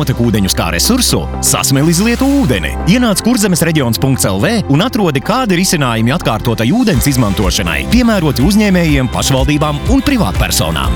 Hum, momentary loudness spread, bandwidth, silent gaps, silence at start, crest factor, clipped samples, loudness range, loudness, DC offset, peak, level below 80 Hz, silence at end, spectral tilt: none; 3 LU; 19.5 kHz; none; 0 s; 12 dB; under 0.1%; 1 LU; -12 LUFS; under 0.1%; 0 dBFS; -22 dBFS; 0 s; -4.5 dB/octave